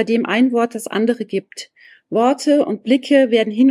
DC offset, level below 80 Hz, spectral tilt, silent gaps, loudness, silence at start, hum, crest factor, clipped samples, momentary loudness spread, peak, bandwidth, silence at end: under 0.1%; -72 dBFS; -5 dB/octave; none; -17 LUFS; 0 s; none; 14 dB; under 0.1%; 11 LU; -4 dBFS; 14 kHz; 0 s